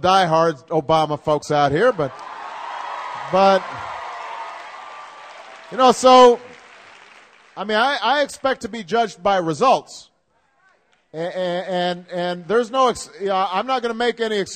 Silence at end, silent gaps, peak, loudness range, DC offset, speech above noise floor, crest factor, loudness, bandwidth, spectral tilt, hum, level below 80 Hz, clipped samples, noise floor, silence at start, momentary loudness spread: 0 s; none; -2 dBFS; 6 LU; under 0.1%; 46 dB; 18 dB; -19 LUFS; 13.5 kHz; -4.5 dB/octave; none; -56 dBFS; under 0.1%; -64 dBFS; 0 s; 19 LU